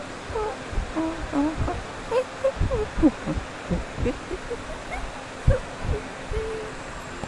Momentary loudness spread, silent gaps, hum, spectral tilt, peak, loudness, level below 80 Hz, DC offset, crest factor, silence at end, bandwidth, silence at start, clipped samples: 10 LU; none; none; -6.5 dB/octave; -6 dBFS; -28 LUFS; -34 dBFS; under 0.1%; 20 dB; 0 s; 11.5 kHz; 0 s; under 0.1%